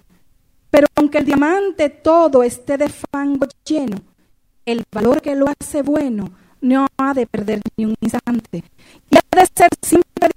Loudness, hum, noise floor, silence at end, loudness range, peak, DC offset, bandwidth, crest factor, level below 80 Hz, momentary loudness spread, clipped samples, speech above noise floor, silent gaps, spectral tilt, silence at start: -16 LUFS; none; -56 dBFS; 0.05 s; 4 LU; 0 dBFS; under 0.1%; 16 kHz; 16 dB; -48 dBFS; 11 LU; under 0.1%; 40 dB; none; -5 dB/octave; 0.75 s